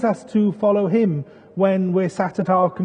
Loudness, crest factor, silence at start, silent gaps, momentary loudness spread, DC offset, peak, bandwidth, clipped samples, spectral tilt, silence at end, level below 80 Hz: -20 LUFS; 16 dB; 0 s; none; 5 LU; under 0.1%; -4 dBFS; 9.4 kHz; under 0.1%; -8.5 dB/octave; 0 s; -64 dBFS